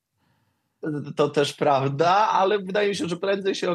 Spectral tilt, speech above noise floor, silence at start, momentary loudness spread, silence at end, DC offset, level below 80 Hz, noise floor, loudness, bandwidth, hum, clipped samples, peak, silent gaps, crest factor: -5 dB/octave; 48 dB; 0.85 s; 11 LU; 0 s; under 0.1%; -76 dBFS; -70 dBFS; -23 LUFS; 12.5 kHz; none; under 0.1%; -8 dBFS; none; 16 dB